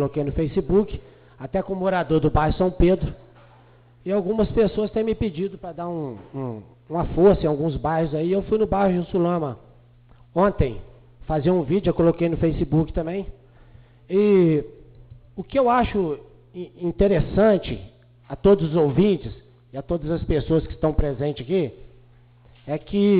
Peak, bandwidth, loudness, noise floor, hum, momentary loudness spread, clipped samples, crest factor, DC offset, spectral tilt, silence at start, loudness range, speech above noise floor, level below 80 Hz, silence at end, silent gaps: -6 dBFS; 4.9 kHz; -22 LUFS; -52 dBFS; 60 Hz at -50 dBFS; 15 LU; under 0.1%; 16 dB; under 0.1%; -12.5 dB/octave; 0 s; 4 LU; 31 dB; -36 dBFS; 0 s; none